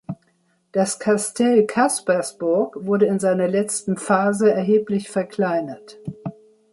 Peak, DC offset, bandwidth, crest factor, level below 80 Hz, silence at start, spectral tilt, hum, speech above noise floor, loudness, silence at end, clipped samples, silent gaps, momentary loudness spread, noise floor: -4 dBFS; under 0.1%; 12 kHz; 18 dB; -66 dBFS; 0.1 s; -5 dB/octave; none; 44 dB; -20 LUFS; 0.4 s; under 0.1%; none; 17 LU; -64 dBFS